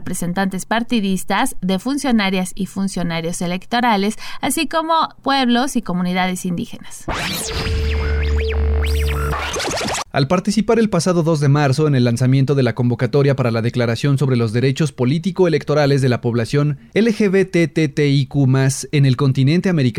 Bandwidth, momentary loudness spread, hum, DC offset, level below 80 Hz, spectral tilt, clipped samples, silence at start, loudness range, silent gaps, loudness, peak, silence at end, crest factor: 16 kHz; 6 LU; none; under 0.1%; -30 dBFS; -6 dB/octave; under 0.1%; 0 s; 4 LU; none; -18 LUFS; -6 dBFS; 0 s; 12 dB